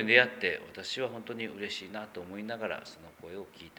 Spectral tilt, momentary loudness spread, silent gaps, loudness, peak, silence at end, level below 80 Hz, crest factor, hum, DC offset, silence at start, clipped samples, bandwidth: -3.5 dB/octave; 18 LU; none; -33 LUFS; -6 dBFS; 0.1 s; -72 dBFS; 26 dB; none; under 0.1%; 0 s; under 0.1%; over 20 kHz